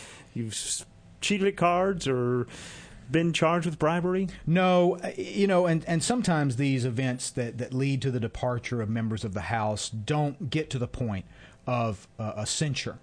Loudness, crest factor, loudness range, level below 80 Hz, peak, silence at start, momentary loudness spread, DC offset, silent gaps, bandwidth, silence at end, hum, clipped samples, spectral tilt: -28 LUFS; 18 dB; 5 LU; -52 dBFS; -10 dBFS; 0 s; 9 LU; under 0.1%; none; 10.5 kHz; 0.05 s; none; under 0.1%; -5.5 dB/octave